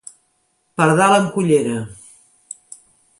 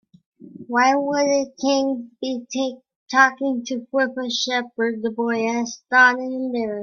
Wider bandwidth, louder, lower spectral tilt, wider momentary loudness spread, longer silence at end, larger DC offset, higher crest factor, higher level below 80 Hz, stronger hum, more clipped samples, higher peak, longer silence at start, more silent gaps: first, 11.5 kHz vs 7.2 kHz; first, -16 LUFS vs -21 LUFS; first, -5.5 dB/octave vs -2.5 dB/octave; first, 22 LU vs 10 LU; first, 1.25 s vs 0 s; neither; about the same, 18 dB vs 20 dB; first, -58 dBFS vs -70 dBFS; neither; neither; about the same, -2 dBFS vs 0 dBFS; first, 0.8 s vs 0.4 s; second, none vs 2.96-3.07 s